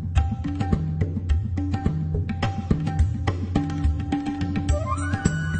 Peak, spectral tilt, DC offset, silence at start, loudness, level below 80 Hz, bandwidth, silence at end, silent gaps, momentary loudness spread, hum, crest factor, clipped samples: -4 dBFS; -7 dB/octave; under 0.1%; 0 s; -25 LUFS; -30 dBFS; 8.6 kHz; 0 s; none; 3 LU; none; 20 dB; under 0.1%